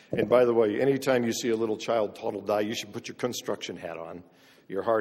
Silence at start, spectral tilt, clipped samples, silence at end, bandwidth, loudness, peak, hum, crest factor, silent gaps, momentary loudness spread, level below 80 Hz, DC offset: 0.1 s; -5 dB/octave; under 0.1%; 0 s; 16 kHz; -27 LUFS; -8 dBFS; none; 18 dB; none; 15 LU; -68 dBFS; under 0.1%